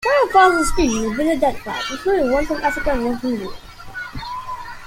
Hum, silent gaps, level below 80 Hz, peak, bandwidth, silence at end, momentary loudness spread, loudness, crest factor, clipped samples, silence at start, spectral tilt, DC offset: none; none; -34 dBFS; -2 dBFS; 16.5 kHz; 0 s; 18 LU; -19 LUFS; 18 dB; under 0.1%; 0 s; -4 dB/octave; under 0.1%